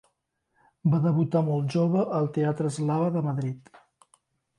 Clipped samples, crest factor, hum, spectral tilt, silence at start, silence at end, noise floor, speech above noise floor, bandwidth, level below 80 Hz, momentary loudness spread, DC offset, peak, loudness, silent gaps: under 0.1%; 16 dB; none; -8.5 dB/octave; 0.85 s; 1 s; -76 dBFS; 51 dB; 11 kHz; -70 dBFS; 6 LU; under 0.1%; -12 dBFS; -26 LUFS; none